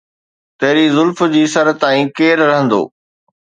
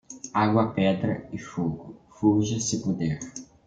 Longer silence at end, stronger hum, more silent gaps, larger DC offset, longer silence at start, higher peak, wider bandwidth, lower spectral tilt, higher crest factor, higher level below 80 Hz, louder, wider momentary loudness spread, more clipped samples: first, 0.65 s vs 0.2 s; neither; neither; neither; first, 0.6 s vs 0.1 s; first, 0 dBFS vs -8 dBFS; about the same, 9.4 kHz vs 9.4 kHz; about the same, -5 dB/octave vs -5.5 dB/octave; about the same, 14 dB vs 18 dB; second, -64 dBFS vs -56 dBFS; first, -13 LUFS vs -26 LUFS; second, 5 LU vs 13 LU; neither